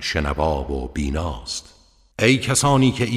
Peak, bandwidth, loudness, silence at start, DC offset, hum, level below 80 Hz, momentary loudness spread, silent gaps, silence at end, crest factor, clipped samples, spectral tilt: -4 dBFS; 15 kHz; -21 LUFS; 0 s; under 0.1%; none; -32 dBFS; 13 LU; none; 0 s; 18 dB; under 0.1%; -4.5 dB/octave